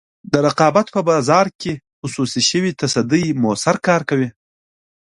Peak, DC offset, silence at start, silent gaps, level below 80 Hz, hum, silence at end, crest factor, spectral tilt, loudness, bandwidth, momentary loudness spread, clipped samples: 0 dBFS; under 0.1%; 0.3 s; 1.55-1.59 s, 1.93-2.02 s; -56 dBFS; none; 0.85 s; 18 dB; -4.5 dB/octave; -17 LUFS; 11.5 kHz; 11 LU; under 0.1%